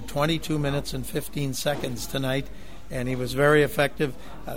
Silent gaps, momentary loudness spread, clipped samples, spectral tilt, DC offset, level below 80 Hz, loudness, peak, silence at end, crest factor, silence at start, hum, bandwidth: none; 12 LU; under 0.1%; -5 dB/octave; 2%; -44 dBFS; -26 LUFS; -6 dBFS; 0 s; 20 dB; 0 s; none; 16.5 kHz